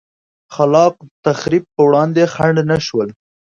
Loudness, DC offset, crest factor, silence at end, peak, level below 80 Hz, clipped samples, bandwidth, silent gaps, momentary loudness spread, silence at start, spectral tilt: -15 LUFS; under 0.1%; 14 dB; 0.5 s; 0 dBFS; -52 dBFS; under 0.1%; 7.6 kHz; 1.11-1.23 s; 9 LU; 0.5 s; -6.5 dB/octave